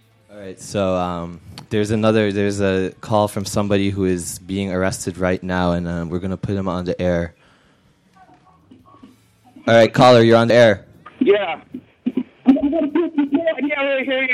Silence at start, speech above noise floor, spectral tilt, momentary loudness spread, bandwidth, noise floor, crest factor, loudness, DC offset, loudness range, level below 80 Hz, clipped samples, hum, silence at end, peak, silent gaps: 0.3 s; 38 dB; -6 dB/octave; 14 LU; 14.5 kHz; -56 dBFS; 16 dB; -18 LUFS; under 0.1%; 9 LU; -48 dBFS; under 0.1%; none; 0 s; -2 dBFS; none